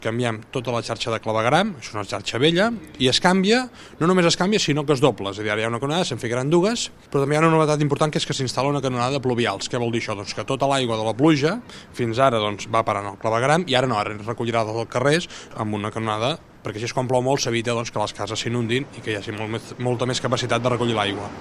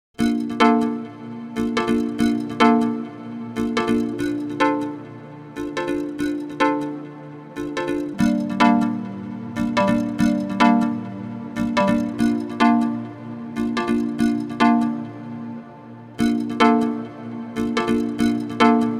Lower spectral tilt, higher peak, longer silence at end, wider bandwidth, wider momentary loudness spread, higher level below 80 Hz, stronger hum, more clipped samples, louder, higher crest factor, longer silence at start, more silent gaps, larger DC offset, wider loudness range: about the same, -5 dB/octave vs -6 dB/octave; about the same, 0 dBFS vs 0 dBFS; about the same, 0 s vs 0 s; about the same, 13.5 kHz vs 12.5 kHz; second, 9 LU vs 16 LU; about the same, -54 dBFS vs -50 dBFS; neither; neither; about the same, -22 LUFS vs -21 LUFS; about the same, 22 dB vs 20 dB; second, 0 s vs 0.2 s; neither; neither; about the same, 4 LU vs 4 LU